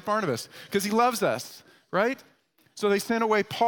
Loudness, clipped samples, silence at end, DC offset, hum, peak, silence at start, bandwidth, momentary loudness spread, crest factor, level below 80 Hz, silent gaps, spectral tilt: -26 LUFS; under 0.1%; 0 s; under 0.1%; none; -10 dBFS; 0.05 s; 18 kHz; 10 LU; 18 dB; -72 dBFS; none; -4 dB/octave